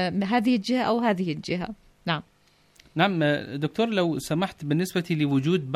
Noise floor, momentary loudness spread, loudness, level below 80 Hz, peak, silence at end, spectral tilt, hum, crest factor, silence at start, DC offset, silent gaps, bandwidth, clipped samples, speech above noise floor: -61 dBFS; 8 LU; -25 LUFS; -60 dBFS; -8 dBFS; 0 s; -6 dB/octave; none; 18 dB; 0 s; under 0.1%; none; 15 kHz; under 0.1%; 37 dB